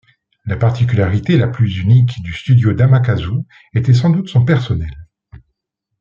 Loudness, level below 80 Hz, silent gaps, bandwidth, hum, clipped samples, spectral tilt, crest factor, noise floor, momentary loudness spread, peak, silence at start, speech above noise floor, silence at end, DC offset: -15 LUFS; -40 dBFS; none; 7.2 kHz; none; under 0.1%; -8.5 dB/octave; 12 dB; -74 dBFS; 10 LU; -2 dBFS; 0.45 s; 61 dB; 0.95 s; under 0.1%